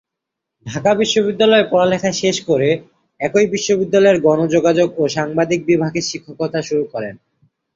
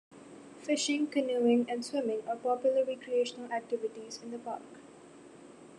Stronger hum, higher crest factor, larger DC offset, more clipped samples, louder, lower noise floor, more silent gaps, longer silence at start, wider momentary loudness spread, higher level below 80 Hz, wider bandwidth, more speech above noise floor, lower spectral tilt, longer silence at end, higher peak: neither; about the same, 14 dB vs 18 dB; neither; neither; first, -16 LUFS vs -32 LUFS; first, -81 dBFS vs -53 dBFS; neither; first, 0.65 s vs 0.1 s; second, 11 LU vs 23 LU; first, -56 dBFS vs -82 dBFS; second, 7.8 kHz vs 11 kHz; first, 65 dB vs 22 dB; about the same, -4.5 dB/octave vs -3.5 dB/octave; first, 0.6 s vs 0 s; first, -2 dBFS vs -16 dBFS